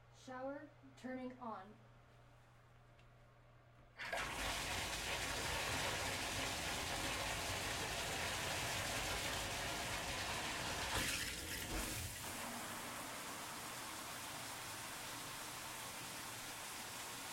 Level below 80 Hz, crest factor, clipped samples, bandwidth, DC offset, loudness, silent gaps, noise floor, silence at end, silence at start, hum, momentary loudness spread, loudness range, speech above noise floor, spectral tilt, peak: -60 dBFS; 18 dB; under 0.1%; 16.5 kHz; under 0.1%; -43 LUFS; none; -65 dBFS; 0 s; 0 s; none; 9 LU; 10 LU; 17 dB; -2 dB/octave; -26 dBFS